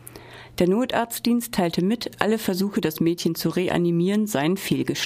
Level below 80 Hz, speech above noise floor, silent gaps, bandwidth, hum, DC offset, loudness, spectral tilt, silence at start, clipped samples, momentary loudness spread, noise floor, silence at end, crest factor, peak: -54 dBFS; 20 dB; none; 15.5 kHz; none; under 0.1%; -23 LUFS; -5.5 dB/octave; 0 s; under 0.1%; 3 LU; -42 dBFS; 0 s; 20 dB; -2 dBFS